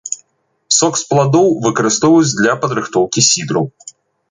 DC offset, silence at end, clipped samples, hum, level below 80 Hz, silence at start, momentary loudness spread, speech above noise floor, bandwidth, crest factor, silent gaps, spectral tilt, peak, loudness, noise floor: under 0.1%; 0.4 s; under 0.1%; none; -56 dBFS; 0.05 s; 8 LU; 48 dB; 10 kHz; 14 dB; none; -3.5 dB/octave; 0 dBFS; -13 LUFS; -62 dBFS